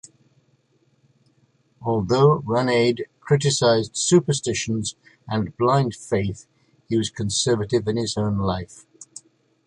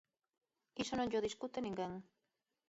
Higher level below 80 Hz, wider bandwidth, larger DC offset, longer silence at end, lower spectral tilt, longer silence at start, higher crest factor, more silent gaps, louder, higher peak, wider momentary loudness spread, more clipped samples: first, -50 dBFS vs -72 dBFS; first, 11.5 kHz vs 8 kHz; neither; about the same, 0.65 s vs 0.65 s; about the same, -5 dB/octave vs -4 dB/octave; first, 1.8 s vs 0.75 s; about the same, 18 dB vs 18 dB; neither; first, -22 LUFS vs -41 LUFS; first, -4 dBFS vs -26 dBFS; about the same, 13 LU vs 12 LU; neither